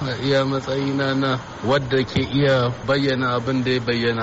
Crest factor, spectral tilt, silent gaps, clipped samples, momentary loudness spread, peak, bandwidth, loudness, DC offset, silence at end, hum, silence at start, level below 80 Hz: 12 dB; -4.5 dB/octave; none; under 0.1%; 4 LU; -10 dBFS; 8 kHz; -21 LUFS; under 0.1%; 0 s; none; 0 s; -46 dBFS